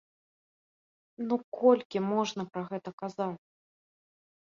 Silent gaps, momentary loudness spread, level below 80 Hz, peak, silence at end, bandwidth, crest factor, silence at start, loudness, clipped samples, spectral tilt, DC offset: 1.44-1.52 s, 1.85-1.90 s, 2.93-2.98 s; 14 LU; -80 dBFS; -10 dBFS; 1.2 s; 7.4 kHz; 22 dB; 1.2 s; -31 LUFS; under 0.1%; -6 dB/octave; under 0.1%